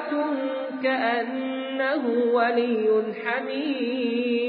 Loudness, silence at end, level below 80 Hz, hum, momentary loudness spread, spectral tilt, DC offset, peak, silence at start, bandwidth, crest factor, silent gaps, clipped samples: -25 LUFS; 0 s; -84 dBFS; none; 6 LU; -9 dB/octave; under 0.1%; -10 dBFS; 0 s; 4.8 kHz; 14 dB; none; under 0.1%